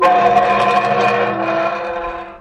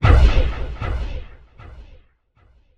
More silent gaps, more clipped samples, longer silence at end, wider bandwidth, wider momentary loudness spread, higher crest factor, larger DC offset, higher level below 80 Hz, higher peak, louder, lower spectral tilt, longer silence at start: neither; neither; second, 0 s vs 0.95 s; first, 9.8 kHz vs 7 kHz; second, 11 LU vs 28 LU; second, 12 dB vs 18 dB; neither; second, -46 dBFS vs -20 dBFS; about the same, -4 dBFS vs -2 dBFS; first, -15 LUFS vs -21 LUFS; second, -5 dB/octave vs -7 dB/octave; about the same, 0 s vs 0 s